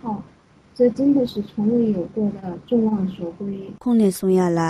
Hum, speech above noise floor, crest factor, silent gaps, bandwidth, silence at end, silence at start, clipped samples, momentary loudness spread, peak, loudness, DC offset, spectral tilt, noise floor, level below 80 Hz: none; 32 dB; 14 dB; none; 15 kHz; 0 s; 0.05 s; under 0.1%; 12 LU; -6 dBFS; -21 LUFS; under 0.1%; -7.5 dB/octave; -52 dBFS; -54 dBFS